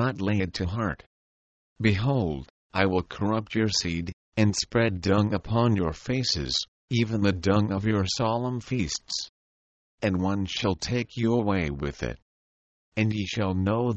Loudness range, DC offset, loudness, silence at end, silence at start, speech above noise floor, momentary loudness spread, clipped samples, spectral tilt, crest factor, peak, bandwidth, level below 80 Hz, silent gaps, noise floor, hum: 3 LU; under 0.1%; -27 LUFS; 0 s; 0 s; over 64 dB; 8 LU; under 0.1%; -5.5 dB/octave; 20 dB; -6 dBFS; 8.6 kHz; -48 dBFS; 1.06-1.76 s, 2.50-2.70 s, 4.13-4.32 s, 6.68-6.88 s, 9.29-9.98 s, 12.22-12.92 s; under -90 dBFS; none